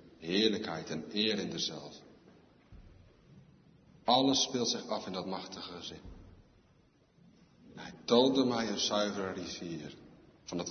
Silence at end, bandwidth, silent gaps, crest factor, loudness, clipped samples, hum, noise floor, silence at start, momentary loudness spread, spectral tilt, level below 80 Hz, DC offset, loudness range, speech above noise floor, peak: 0 s; 6.6 kHz; none; 24 dB; -32 LUFS; under 0.1%; none; -67 dBFS; 0.05 s; 22 LU; -3.5 dB/octave; -66 dBFS; under 0.1%; 6 LU; 34 dB; -12 dBFS